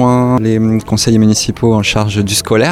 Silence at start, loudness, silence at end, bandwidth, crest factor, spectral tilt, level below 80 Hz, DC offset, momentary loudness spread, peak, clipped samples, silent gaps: 0 s; -12 LUFS; 0 s; 15.5 kHz; 10 dB; -5 dB/octave; -34 dBFS; 0.1%; 3 LU; 0 dBFS; under 0.1%; none